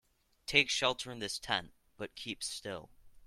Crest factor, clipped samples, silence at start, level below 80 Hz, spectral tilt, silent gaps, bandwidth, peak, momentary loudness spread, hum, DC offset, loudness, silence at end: 26 dB; under 0.1%; 0.5 s; -64 dBFS; -2 dB/octave; none; 16.5 kHz; -10 dBFS; 18 LU; none; under 0.1%; -33 LUFS; 0.1 s